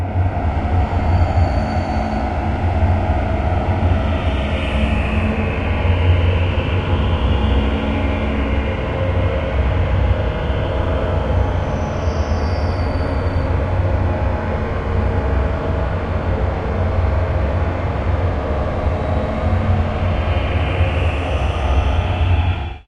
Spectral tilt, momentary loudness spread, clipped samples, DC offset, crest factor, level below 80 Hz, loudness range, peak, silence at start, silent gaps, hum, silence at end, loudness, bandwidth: -8 dB/octave; 3 LU; under 0.1%; under 0.1%; 14 dB; -22 dBFS; 2 LU; -4 dBFS; 0 s; none; none; 0.05 s; -19 LUFS; 6.8 kHz